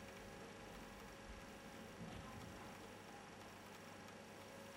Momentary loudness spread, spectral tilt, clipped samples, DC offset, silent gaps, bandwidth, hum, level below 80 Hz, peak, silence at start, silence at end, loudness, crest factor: 3 LU; -4 dB/octave; under 0.1%; under 0.1%; none; 16 kHz; 50 Hz at -65 dBFS; -68 dBFS; -42 dBFS; 0 s; 0 s; -56 LUFS; 14 dB